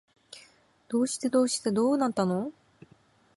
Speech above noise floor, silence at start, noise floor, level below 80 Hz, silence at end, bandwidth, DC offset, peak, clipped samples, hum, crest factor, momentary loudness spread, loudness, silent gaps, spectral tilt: 35 dB; 0.3 s; -62 dBFS; -72 dBFS; 0.85 s; 11.5 kHz; under 0.1%; -12 dBFS; under 0.1%; none; 16 dB; 22 LU; -27 LUFS; none; -5 dB/octave